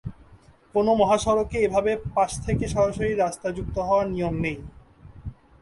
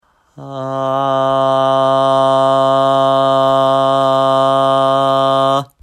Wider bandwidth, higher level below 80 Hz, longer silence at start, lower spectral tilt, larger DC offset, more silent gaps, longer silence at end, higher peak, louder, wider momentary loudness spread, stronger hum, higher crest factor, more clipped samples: about the same, 11.5 kHz vs 12 kHz; first, -42 dBFS vs -60 dBFS; second, 0.05 s vs 0.4 s; about the same, -6 dB/octave vs -6 dB/octave; neither; neither; first, 0.3 s vs 0.15 s; second, -8 dBFS vs -4 dBFS; second, -24 LUFS vs -13 LUFS; first, 19 LU vs 4 LU; neither; first, 18 dB vs 10 dB; neither